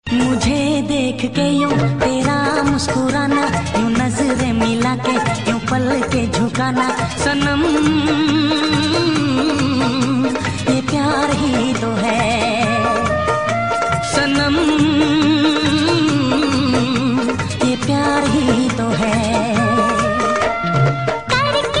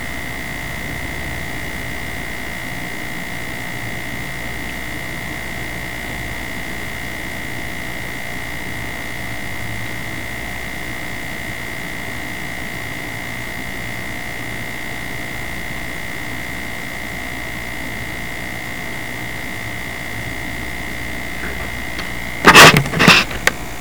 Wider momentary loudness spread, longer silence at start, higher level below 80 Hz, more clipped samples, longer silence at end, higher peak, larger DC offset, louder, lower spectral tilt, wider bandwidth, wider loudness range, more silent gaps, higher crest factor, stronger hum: second, 3 LU vs 7 LU; about the same, 0.05 s vs 0 s; about the same, -40 dBFS vs -38 dBFS; neither; about the same, 0 s vs 0 s; about the same, -2 dBFS vs 0 dBFS; second, 0.7% vs 3%; first, -16 LUFS vs -19 LUFS; first, -5 dB/octave vs -3 dB/octave; second, 11 kHz vs over 20 kHz; second, 2 LU vs 13 LU; neither; second, 14 dB vs 22 dB; neither